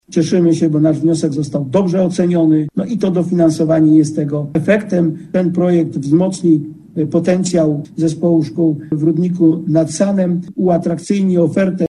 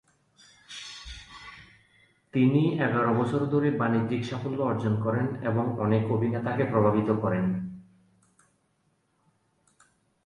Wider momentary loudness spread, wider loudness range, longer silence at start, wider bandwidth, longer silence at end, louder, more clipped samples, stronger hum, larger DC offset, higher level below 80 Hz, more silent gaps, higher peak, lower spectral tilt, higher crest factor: second, 5 LU vs 18 LU; second, 1 LU vs 4 LU; second, 0.1 s vs 0.7 s; about the same, 11 kHz vs 10.5 kHz; second, 0.15 s vs 2.45 s; first, -15 LUFS vs -26 LUFS; neither; neither; neither; first, -52 dBFS vs -58 dBFS; neither; first, 0 dBFS vs -10 dBFS; about the same, -7.5 dB/octave vs -8 dB/octave; about the same, 14 dB vs 18 dB